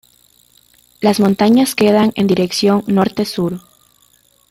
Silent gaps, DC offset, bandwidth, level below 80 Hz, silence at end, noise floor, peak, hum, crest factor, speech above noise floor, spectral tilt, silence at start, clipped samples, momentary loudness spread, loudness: none; under 0.1%; 16 kHz; -54 dBFS; 0.9 s; -54 dBFS; -2 dBFS; none; 14 dB; 41 dB; -5.5 dB/octave; 1 s; under 0.1%; 8 LU; -14 LUFS